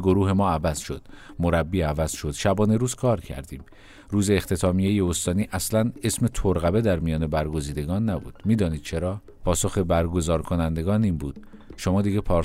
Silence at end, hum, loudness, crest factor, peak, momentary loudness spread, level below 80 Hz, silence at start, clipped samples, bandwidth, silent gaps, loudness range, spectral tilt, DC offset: 0 s; none; -24 LUFS; 16 dB; -8 dBFS; 9 LU; -38 dBFS; 0 s; under 0.1%; 16 kHz; none; 2 LU; -6 dB/octave; under 0.1%